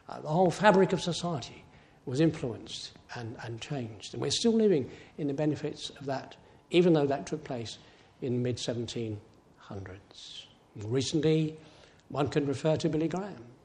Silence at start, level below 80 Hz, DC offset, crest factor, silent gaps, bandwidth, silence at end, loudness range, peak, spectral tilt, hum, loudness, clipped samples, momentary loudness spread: 0.1 s; -64 dBFS; under 0.1%; 24 dB; none; 11 kHz; 0.1 s; 6 LU; -6 dBFS; -5.5 dB/octave; none; -30 LUFS; under 0.1%; 19 LU